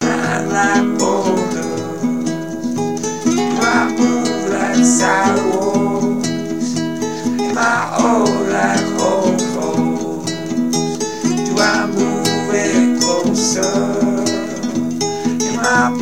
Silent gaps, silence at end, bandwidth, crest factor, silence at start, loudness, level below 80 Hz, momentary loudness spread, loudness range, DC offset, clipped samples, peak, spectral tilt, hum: none; 0 s; 16 kHz; 16 dB; 0 s; -16 LUFS; -56 dBFS; 7 LU; 2 LU; 1%; under 0.1%; 0 dBFS; -4 dB/octave; none